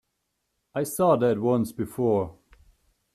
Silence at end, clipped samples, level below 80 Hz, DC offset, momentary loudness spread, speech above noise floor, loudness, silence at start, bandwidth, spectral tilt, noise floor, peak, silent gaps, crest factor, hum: 0.85 s; under 0.1%; -60 dBFS; under 0.1%; 11 LU; 54 dB; -25 LUFS; 0.75 s; 14.5 kHz; -7 dB/octave; -78 dBFS; -8 dBFS; none; 18 dB; none